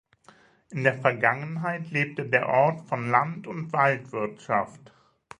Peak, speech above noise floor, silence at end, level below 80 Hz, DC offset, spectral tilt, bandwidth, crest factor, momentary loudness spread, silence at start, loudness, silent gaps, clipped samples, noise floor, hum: -4 dBFS; 31 dB; 0.6 s; -70 dBFS; under 0.1%; -7 dB/octave; 10.5 kHz; 24 dB; 10 LU; 0.7 s; -25 LUFS; none; under 0.1%; -57 dBFS; none